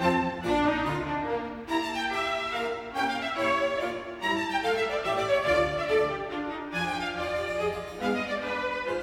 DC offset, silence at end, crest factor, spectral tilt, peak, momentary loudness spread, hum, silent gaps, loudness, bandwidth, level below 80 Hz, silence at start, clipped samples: under 0.1%; 0 s; 16 dB; -5 dB/octave; -12 dBFS; 6 LU; none; none; -28 LUFS; 17 kHz; -52 dBFS; 0 s; under 0.1%